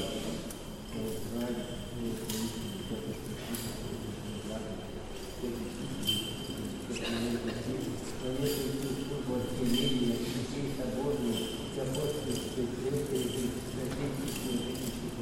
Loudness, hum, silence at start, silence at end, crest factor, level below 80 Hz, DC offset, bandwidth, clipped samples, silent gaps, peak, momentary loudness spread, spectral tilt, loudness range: -35 LUFS; none; 0 s; 0 s; 16 dB; -48 dBFS; under 0.1%; 16 kHz; under 0.1%; none; -18 dBFS; 8 LU; -5 dB/octave; 5 LU